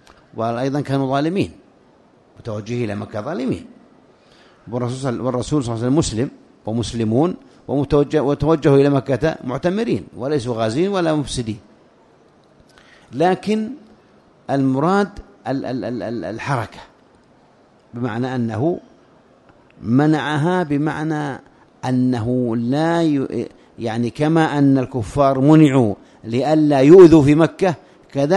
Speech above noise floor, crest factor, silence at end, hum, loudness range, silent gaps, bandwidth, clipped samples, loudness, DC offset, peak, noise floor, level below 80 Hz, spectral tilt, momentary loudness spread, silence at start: 35 dB; 18 dB; 0 s; none; 12 LU; none; 11 kHz; under 0.1%; -18 LUFS; under 0.1%; 0 dBFS; -52 dBFS; -46 dBFS; -7 dB/octave; 15 LU; 0.35 s